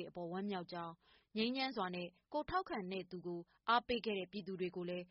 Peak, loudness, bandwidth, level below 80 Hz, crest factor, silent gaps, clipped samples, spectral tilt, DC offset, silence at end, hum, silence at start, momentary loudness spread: -22 dBFS; -42 LUFS; 5.8 kHz; -70 dBFS; 20 dB; none; under 0.1%; -3 dB/octave; under 0.1%; 0.05 s; none; 0 s; 11 LU